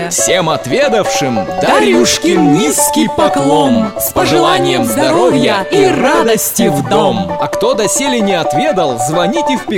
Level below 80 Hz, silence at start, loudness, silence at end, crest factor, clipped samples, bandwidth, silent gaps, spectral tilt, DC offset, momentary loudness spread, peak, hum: -42 dBFS; 0 s; -11 LUFS; 0 s; 10 dB; under 0.1%; 16.5 kHz; none; -3.5 dB/octave; under 0.1%; 4 LU; 0 dBFS; none